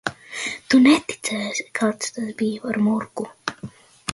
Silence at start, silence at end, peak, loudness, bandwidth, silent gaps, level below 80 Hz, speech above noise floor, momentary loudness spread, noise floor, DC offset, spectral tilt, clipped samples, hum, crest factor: 0.05 s; 0 s; -4 dBFS; -22 LUFS; 11.5 kHz; none; -60 dBFS; 20 dB; 16 LU; -40 dBFS; under 0.1%; -4 dB/octave; under 0.1%; none; 18 dB